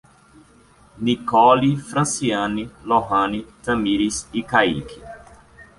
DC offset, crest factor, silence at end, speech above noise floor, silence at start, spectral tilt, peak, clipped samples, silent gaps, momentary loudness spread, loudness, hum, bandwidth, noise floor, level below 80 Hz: under 0.1%; 20 dB; 0.15 s; 32 dB; 0.95 s; -4.5 dB/octave; -2 dBFS; under 0.1%; none; 14 LU; -20 LUFS; none; 11.5 kHz; -52 dBFS; -48 dBFS